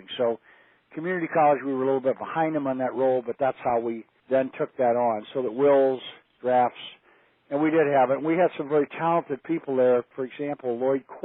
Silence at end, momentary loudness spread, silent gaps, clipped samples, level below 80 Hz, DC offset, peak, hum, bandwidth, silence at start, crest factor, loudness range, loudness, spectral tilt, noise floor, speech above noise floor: 0.05 s; 11 LU; none; under 0.1%; -74 dBFS; under 0.1%; -10 dBFS; none; 4 kHz; 0.1 s; 16 dB; 2 LU; -25 LUFS; -5 dB/octave; -61 dBFS; 37 dB